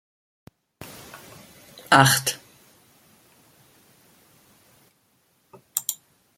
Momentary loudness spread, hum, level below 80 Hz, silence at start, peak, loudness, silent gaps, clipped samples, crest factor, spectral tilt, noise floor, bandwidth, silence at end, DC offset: 30 LU; none; -66 dBFS; 0.8 s; 0 dBFS; -20 LUFS; none; under 0.1%; 28 dB; -3 dB/octave; -66 dBFS; 17 kHz; 0.45 s; under 0.1%